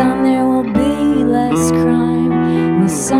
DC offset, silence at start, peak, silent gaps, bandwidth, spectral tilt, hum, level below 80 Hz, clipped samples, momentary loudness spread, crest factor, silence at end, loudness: under 0.1%; 0 s; -2 dBFS; none; 14.5 kHz; -6 dB/octave; none; -38 dBFS; under 0.1%; 1 LU; 12 dB; 0 s; -14 LUFS